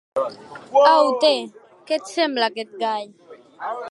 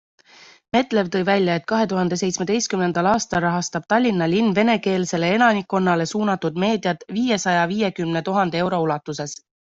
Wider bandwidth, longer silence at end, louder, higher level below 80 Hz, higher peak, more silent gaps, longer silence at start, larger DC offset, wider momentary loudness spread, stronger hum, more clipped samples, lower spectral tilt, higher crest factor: first, 11.5 kHz vs 8 kHz; second, 0 s vs 0.3 s; about the same, -20 LUFS vs -20 LUFS; second, -76 dBFS vs -58 dBFS; about the same, -2 dBFS vs -2 dBFS; neither; second, 0.15 s vs 0.75 s; neither; first, 18 LU vs 6 LU; neither; neither; second, -2.5 dB/octave vs -5 dB/octave; about the same, 18 dB vs 18 dB